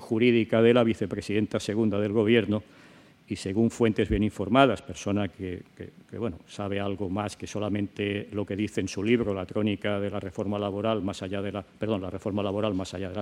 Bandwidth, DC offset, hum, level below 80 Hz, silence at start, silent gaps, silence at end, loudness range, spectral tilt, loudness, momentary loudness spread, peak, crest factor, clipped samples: 12 kHz; under 0.1%; none; -52 dBFS; 0 s; none; 0 s; 6 LU; -6.5 dB/octave; -27 LUFS; 13 LU; -4 dBFS; 24 dB; under 0.1%